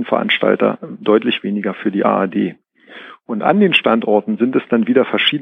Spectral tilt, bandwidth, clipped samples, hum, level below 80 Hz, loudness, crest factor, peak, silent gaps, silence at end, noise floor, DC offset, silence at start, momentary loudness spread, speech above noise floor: -7.5 dB/octave; 5.4 kHz; under 0.1%; none; -70 dBFS; -16 LUFS; 16 dB; 0 dBFS; none; 0 s; -39 dBFS; under 0.1%; 0 s; 9 LU; 23 dB